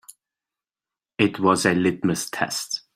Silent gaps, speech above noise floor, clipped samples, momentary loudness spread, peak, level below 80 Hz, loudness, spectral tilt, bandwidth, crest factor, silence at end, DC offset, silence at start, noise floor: none; over 68 dB; under 0.1%; 7 LU; -4 dBFS; -62 dBFS; -22 LUFS; -4.5 dB/octave; 16 kHz; 20 dB; 0.15 s; under 0.1%; 0.1 s; under -90 dBFS